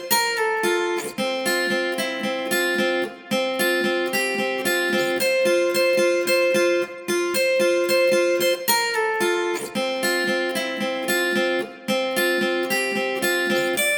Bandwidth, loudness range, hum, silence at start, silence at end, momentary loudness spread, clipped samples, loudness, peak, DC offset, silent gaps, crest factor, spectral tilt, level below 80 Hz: over 20 kHz; 3 LU; none; 0 s; 0 s; 6 LU; under 0.1%; -21 LUFS; -6 dBFS; under 0.1%; none; 16 dB; -2.5 dB/octave; -74 dBFS